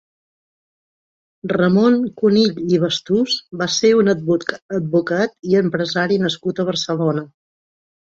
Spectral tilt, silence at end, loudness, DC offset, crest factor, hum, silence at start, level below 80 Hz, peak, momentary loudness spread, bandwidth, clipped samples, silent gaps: -5.5 dB/octave; 0.85 s; -18 LUFS; under 0.1%; 16 dB; none; 1.45 s; -60 dBFS; -2 dBFS; 7 LU; 8 kHz; under 0.1%; 4.62-4.69 s